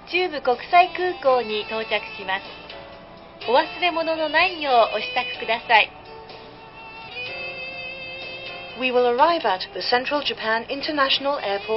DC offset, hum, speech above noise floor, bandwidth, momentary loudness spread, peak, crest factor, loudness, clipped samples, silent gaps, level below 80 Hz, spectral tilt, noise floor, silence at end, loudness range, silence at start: under 0.1%; none; 21 dB; 5.8 kHz; 20 LU; -2 dBFS; 22 dB; -22 LUFS; under 0.1%; none; -58 dBFS; -7 dB/octave; -42 dBFS; 0 s; 4 LU; 0 s